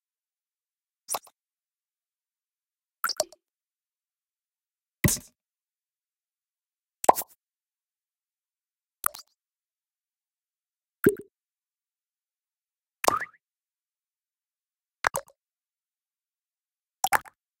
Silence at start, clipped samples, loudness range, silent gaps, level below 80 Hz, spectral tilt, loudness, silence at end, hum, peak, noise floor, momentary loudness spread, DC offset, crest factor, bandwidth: 1.1 s; under 0.1%; 8 LU; none; -56 dBFS; -3.5 dB/octave; -28 LUFS; 0.4 s; none; 0 dBFS; under -90 dBFS; 11 LU; under 0.1%; 34 dB; 16.5 kHz